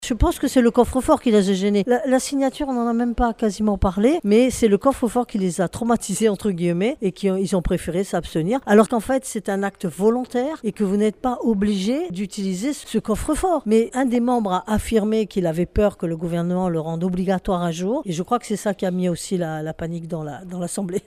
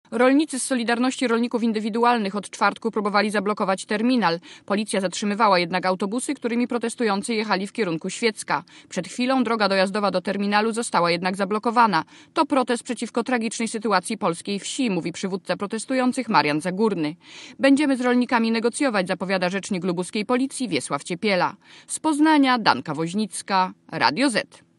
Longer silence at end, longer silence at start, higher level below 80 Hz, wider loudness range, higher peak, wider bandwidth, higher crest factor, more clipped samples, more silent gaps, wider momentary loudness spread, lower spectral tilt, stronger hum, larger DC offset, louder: second, 0.05 s vs 0.35 s; about the same, 0 s vs 0.1 s; first, -36 dBFS vs -74 dBFS; about the same, 3 LU vs 3 LU; second, -4 dBFS vs 0 dBFS; first, 15.5 kHz vs 12 kHz; about the same, 18 dB vs 22 dB; neither; neither; about the same, 8 LU vs 8 LU; first, -6 dB/octave vs -4.5 dB/octave; neither; neither; about the same, -21 LUFS vs -22 LUFS